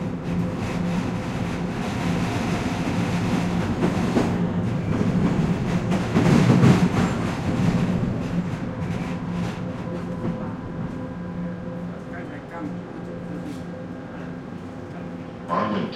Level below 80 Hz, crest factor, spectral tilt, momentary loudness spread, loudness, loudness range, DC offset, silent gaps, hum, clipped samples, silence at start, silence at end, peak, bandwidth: -42 dBFS; 20 dB; -7 dB/octave; 14 LU; -25 LUFS; 12 LU; under 0.1%; none; none; under 0.1%; 0 s; 0 s; -4 dBFS; 12 kHz